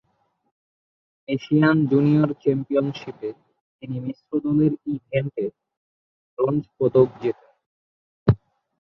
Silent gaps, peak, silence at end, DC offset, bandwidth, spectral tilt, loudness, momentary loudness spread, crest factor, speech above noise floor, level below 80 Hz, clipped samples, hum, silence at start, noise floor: 3.61-3.79 s, 5.77-6.37 s, 7.66-8.26 s; -2 dBFS; 0.45 s; under 0.1%; 6 kHz; -10 dB/octave; -22 LUFS; 15 LU; 20 dB; 48 dB; -50 dBFS; under 0.1%; none; 1.3 s; -70 dBFS